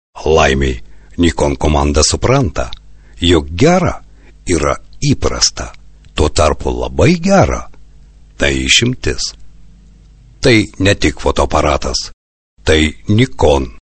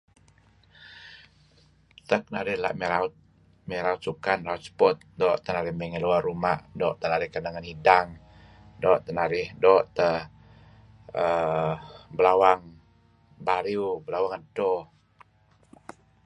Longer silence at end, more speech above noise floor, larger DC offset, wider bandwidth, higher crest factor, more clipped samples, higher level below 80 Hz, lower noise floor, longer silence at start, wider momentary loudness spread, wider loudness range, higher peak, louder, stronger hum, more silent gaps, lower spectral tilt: second, 0.2 s vs 1.4 s; second, 29 dB vs 37 dB; neither; second, 8.8 kHz vs 9.8 kHz; second, 14 dB vs 26 dB; neither; first, -24 dBFS vs -58 dBFS; second, -41 dBFS vs -62 dBFS; second, 0.15 s vs 0.85 s; about the same, 11 LU vs 13 LU; second, 2 LU vs 7 LU; about the same, 0 dBFS vs -2 dBFS; first, -13 LUFS vs -26 LUFS; neither; first, 12.13-12.57 s vs none; second, -4.5 dB/octave vs -6 dB/octave